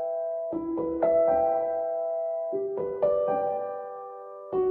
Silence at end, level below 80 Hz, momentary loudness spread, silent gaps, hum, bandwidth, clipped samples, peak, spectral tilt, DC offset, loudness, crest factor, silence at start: 0 s; -60 dBFS; 13 LU; none; none; 3.2 kHz; under 0.1%; -12 dBFS; -10.5 dB/octave; under 0.1%; -28 LUFS; 14 dB; 0 s